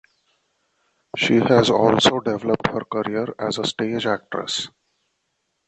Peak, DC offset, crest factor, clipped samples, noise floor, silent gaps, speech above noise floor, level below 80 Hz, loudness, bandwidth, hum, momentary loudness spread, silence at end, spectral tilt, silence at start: -2 dBFS; under 0.1%; 20 dB; under 0.1%; -73 dBFS; none; 53 dB; -56 dBFS; -20 LUFS; 8.8 kHz; none; 10 LU; 1 s; -4.5 dB/octave; 1.15 s